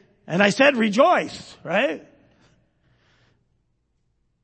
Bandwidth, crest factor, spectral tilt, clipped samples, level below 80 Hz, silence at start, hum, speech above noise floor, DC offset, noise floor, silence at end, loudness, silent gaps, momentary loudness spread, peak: 8.8 kHz; 22 dB; -4.5 dB/octave; under 0.1%; -68 dBFS; 0.3 s; none; 50 dB; under 0.1%; -70 dBFS; 2.45 s; -19 LUFS; none; 17 LU; -2 dBFS